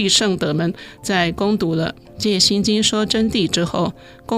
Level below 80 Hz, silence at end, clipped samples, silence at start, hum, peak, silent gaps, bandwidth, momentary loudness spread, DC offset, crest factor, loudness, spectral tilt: -46 dBFS; 0 s; under 0.1%; 0 s; none; -2 dBFS; none; 15.5 kHz; 10 LU; under 0.1%; 16 dB; -18 LUFS; -3.5 dB/octave